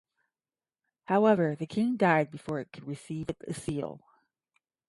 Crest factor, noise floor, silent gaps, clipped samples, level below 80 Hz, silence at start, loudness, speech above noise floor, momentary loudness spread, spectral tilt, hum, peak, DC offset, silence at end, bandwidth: 20 dB; under -90 dBFS; none; under 0.1%; -64 dBFS; 1.1 s; -29 LUFS; over 61 dB; 14 LU; -7 dB/octave; none; -10 dBFS; under 0.1%; 0.9 s; 11.5 kHz